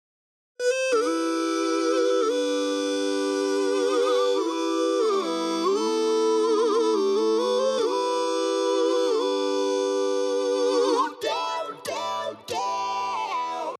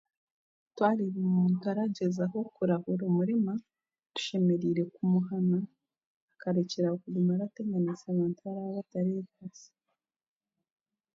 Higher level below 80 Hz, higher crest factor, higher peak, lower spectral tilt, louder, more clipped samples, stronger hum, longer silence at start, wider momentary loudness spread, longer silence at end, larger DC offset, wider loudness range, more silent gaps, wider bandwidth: second, -84 dBFS vs -76 dBFS; about the same, 14 dB vs 18 dB; about the same, -10 dBFS vs -12 dBFS; second, -2.5 dB/octave vs -7.5 dB/octave; first, -24 LUFS vs -31 LUFS; neither; neither; second, 0.6 s vs 0.75 s; second, 6 LU vs 9 LU; second, 0.05 s vs 1.5 s; neither; about the same, 3 LU vs 5 LU; second, none vs 6.06-6.28 s; first, 13.5 kHz vs 7.6 kHz